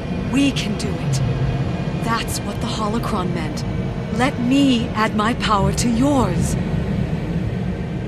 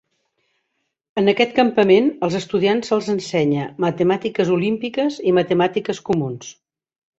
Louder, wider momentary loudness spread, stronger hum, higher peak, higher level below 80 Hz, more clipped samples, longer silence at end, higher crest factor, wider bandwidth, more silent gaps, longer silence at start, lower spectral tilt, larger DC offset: about the same, -20 LUFS vs -19 LUFS; about the same, 7 LU vs 7 LU; neither; about the same, -4 dBFS vs -2 dBFS; first, -32 dBFS vs -60 dBFS; neither; second, 0 s vs 0.65 s; about the same, 16 dB vs 18 dB; first, 14 kHz vs 8 kHz; neither; second, 0 s vs 1.15 s; about the same, -5.5 dB/octave vs -6 dB/octave; first, 0.1% vs under 0.1%